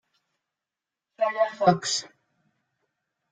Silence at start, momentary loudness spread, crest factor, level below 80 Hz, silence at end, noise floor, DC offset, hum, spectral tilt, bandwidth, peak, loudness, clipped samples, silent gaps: 1.2 s; 7 LU; 24 dB; -72 dBFS; 1.25 s; -88 dBFS; under 0.1%; none; -4 dB/octave; 9.6 kHz; -6 dBFS; -25 LUFS; under 0.1%; none